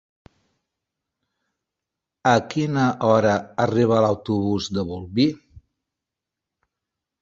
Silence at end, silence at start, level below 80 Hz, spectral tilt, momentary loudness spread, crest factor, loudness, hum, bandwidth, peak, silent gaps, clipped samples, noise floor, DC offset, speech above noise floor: 1.65 s; 2.25 s; -52 dBFS; -6.5 dB/octave; 8 LU; 20 dB; -21 LUFS; none; 7.8 kHz; -4 dBFS; none; under 0.1%; -86 dBFS; under 0.1%; 65 dB